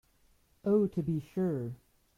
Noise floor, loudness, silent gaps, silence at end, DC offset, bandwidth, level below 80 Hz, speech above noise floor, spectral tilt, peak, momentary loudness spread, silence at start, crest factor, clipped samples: -68 dBFS; -32 LUFS; none; 0.4 s; under 0.1%; 14.5 kHz; -64 dBFS; 37 dB; -10 dB/octave; -16 dBFS; 12 LU; 0.65 s; 18 dB; under 0.1%